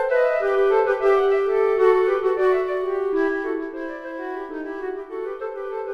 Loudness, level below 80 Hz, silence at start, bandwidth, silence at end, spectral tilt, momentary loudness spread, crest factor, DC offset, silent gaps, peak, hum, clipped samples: -22 LUFS; -54 dBFS; 0 s; 5.8 kHz; 0 s; -5 dB/octave; 13 LU; 16 dB; under 0.1%; none; -6 dBFS; none; under 0.1%